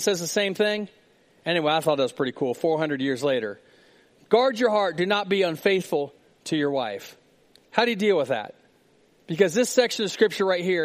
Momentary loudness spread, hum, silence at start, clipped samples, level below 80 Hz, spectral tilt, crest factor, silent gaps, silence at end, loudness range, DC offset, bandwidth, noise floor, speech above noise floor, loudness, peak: 11 LU; none; 0 s; under 0.1%; -74 dBFS; -4 dB/octave; 22 dB; none; 0 s; 2 LU; under 0.1%; 15.5 kHz; -60 dBFS; 37 dB; -24 LUFS; -4 dBFS